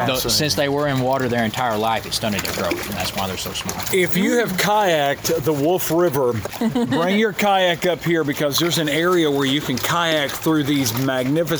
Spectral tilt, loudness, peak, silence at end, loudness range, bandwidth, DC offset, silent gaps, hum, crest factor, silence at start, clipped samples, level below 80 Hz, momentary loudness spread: -4 dB/octave; -19 LUFS; -4 dBFS; 0 s; 2 LU; over 20 kHz; under 0.1%; none; none; 16 dB; 0 s; under 0.1%; -48 dBFS; 6 LU